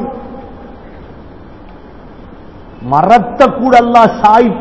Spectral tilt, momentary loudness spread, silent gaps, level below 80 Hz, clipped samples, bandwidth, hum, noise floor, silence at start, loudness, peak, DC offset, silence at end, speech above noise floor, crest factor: -6.5 dB/octave; 22 LU; none; -38 dBFS; 2%; 8 kHz; none; -33 dBFS; 0 s; -8 LUFS; 0 dBFS; 0.8%; 0 s; 25 dB; 12 dB